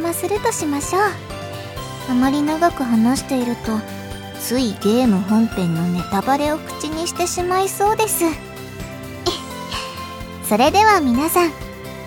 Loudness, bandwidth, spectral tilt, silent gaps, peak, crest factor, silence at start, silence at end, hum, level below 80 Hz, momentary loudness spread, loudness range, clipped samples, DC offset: -19 LUFS; 17.5 kHz; -4.5 dB/octave; none; -2 dBFS; 18 dB; 0 s; 0 s; none; -42 dBFS; 14 LU; 3 LU; under 0.1%; under 0.1%